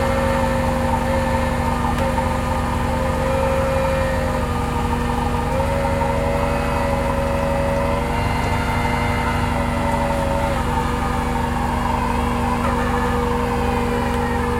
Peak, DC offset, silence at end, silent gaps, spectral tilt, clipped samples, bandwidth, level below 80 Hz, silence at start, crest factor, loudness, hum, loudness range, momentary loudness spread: -4 dBFS; under 0.1%; 0 s; none; -6 dB/octave; under 0.1%; 16.5 kHz; -26 dBFS; 0 s; 14 dB; -20 LUFS; 60 Hz at -30 dBFS; 0 LU; 2 LU